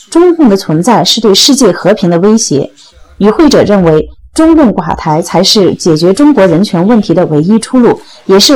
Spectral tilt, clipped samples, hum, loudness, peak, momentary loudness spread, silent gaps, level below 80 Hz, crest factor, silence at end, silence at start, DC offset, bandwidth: -5 dB/octave; 5%; none; -7 LUFS; 0 dBFS; 6 LU; none; -34 dBFS; 6 dB; 0 s; 0.1 s; under 0.1%; over 20 kHz